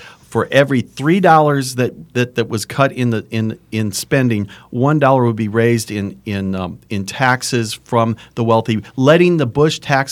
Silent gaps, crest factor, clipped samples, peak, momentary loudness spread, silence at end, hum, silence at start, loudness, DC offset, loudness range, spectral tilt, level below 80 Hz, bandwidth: none; 16 dB; under 0.1%; 0 dBFS; 11 LU; 0 s; none; 0 s; -16 LUFS; under 0.1%; 3 LU; -6 dB/octave; -54 dBFS; 19 kHz